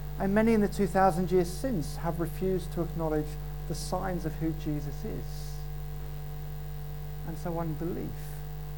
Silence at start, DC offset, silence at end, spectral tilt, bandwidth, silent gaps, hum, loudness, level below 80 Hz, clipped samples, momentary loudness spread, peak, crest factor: 0 s; 0.8%; 0 s; -7 dB/octave; 19 kHz; none; none; -32 LUFS; -40 dBFS; under 0.1%; 15 LU; -10 dBFS; 20 dB